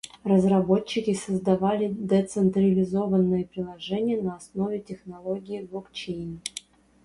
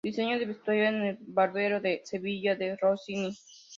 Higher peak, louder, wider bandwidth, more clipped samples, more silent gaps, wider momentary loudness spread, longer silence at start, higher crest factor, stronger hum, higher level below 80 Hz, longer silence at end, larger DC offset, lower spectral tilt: first, -8 dBFS vs -14 dBFS; first, -26 LUFS vs -30 LUFS; first, 11.5 kHz vs 7.6 kHz; neither; neither; first, 14 LU vs 8 LU; about the same, 0.05 s vs 0.05 s; about the same, 16 dB vs 16 dB; neither; first, -58 dBFS vs -74 dBFS; first, 0.45 s vs 0 s; neither; first, -7 dB/octave vs -5.5 dB/octave